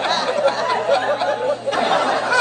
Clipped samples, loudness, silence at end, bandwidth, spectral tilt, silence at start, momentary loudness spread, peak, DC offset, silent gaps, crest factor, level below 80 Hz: under 0.1%; -19 LUFS; 0 s; 9.8 kHz; -2.5 dB/octave; 0 s; 3 LU; -4 dBFS; under 0.1%; none; 16 dB; -64 dBFS